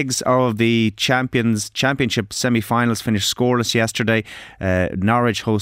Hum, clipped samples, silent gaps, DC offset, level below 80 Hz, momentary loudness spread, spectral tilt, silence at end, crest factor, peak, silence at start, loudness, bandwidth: none; under 0.1%; none; under 0.1%; -48 dBFS; 3 LU; -4.5 dB/octave; 0 s; 14 dB; -4 dBFS; 0 s; -19 LUFS; 16 kHz